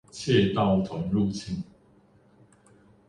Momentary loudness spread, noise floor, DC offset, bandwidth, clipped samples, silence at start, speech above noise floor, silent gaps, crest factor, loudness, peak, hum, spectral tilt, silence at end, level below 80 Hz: 13 LU; -59 dBFS; under 0.1%; 11 kHz; under 0.1%; 0.15 s; 34 dB; none; 18 dB; -26 LUFS; -10 dBFS; none; -6.5 dB/octave; 1.45 s; -52 dBFS